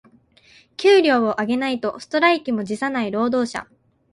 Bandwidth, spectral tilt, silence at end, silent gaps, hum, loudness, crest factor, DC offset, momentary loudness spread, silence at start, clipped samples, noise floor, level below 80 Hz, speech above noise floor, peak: 11.5 kHz; -4.5 dB/octave; 0.5 s; none; none; -20 LUFS; 18 dB; under 0.1%; 11 LU; 0.8 s; under 0.1%; -53 dBFS; -62 dBFS; 34 dB; -2 dBFS